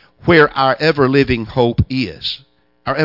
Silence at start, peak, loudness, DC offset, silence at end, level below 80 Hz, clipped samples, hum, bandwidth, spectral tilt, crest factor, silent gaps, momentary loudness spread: 0.25 s; 0 dBFS; -15 LUFS; under 0.1%; 0 s; -38 dBFS; under 0.1%; none; 5.8 kHz; -7.5 dB/octave; 16 dB; none; 12 LU